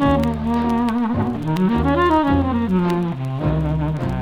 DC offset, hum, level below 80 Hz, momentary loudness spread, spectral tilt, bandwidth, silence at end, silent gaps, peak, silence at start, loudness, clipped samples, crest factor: under 0.1%; none; -34 dBFS; 6 LU; -8.5 dB/octave; 14 kHz; 0 s; none; -6 dBFS; 0 s; -19 LUFS; under 0.1%; 14 dB